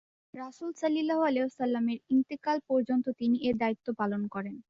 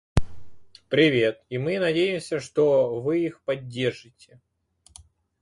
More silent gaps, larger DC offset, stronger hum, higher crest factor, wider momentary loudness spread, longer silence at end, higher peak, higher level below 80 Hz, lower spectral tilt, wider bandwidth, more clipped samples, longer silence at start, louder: neither; neither; neither; second, 12 dB vs 22 dB; about the same, 11 LU vs 10 LU; second, 0.1 s vs 1.4 s; second, -18 dBFS vs -4 dBFS; second, -70 dBFS vs -42 dBFS; about the same, -6.5 dB/octave vs -6 dB/octave; second, 7.6 kHz vs 11.5 kHz; neither; first, 0.35 s vs 0.15 s; second, -30 LUFS vs -24 LUFS